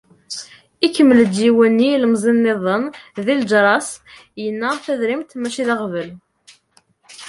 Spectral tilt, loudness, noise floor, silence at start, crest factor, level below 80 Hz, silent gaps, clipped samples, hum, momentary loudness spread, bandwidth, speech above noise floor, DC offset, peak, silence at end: -5 dB/octave; -17 LUFS; -58 dBFS; 0.3 s; 16 dB; -62 dBFS; none; under 0.1%; none; 17 LU; 11.5 kHz; 41 dB; under 0.1%; -2 dBFS; 0 s